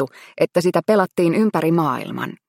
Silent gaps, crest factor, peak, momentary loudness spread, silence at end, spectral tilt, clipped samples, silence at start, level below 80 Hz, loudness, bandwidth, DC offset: none; 16 dB; -2 dBFS; 8 LU; 0.15 s; -7 dB/octave; under 0.1%; 0 s; -66 dBFS; -19 LUFS; 16.5 kHz; under 0.1%